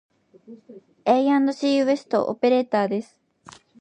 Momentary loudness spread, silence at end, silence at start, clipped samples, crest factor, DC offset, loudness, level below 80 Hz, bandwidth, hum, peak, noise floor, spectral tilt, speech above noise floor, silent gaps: 7 LU; 0.8 s; 0.5 s; under 0.1%; 18 dB; under 0.1%; -22 LUFS; -74 dBFS; 9 kHz; none; -6 dBFS; -49 dBFS; -5.5 dB/octave; 28 dB; none